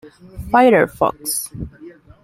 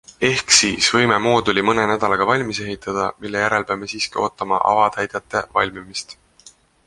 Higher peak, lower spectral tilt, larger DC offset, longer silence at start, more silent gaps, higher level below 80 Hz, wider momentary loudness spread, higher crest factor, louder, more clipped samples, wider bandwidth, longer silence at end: about the same, -2 dBFS vs 0 dBFS; first, -4.5 dB/octave vs -2.5 dB/octave; neither; second, 0.05 s vs 0.2 s; neither; first, -42 dBFS vs -50 dBFS; first, 21 LU vs 12 LU; about the same, 16 dB vs 20 dB; about the same, -16 LUFS vs -18 LUFS; neither; first, 16.5 kHz vs 11.5 kHz; second, 0.35 s vs 0.75 s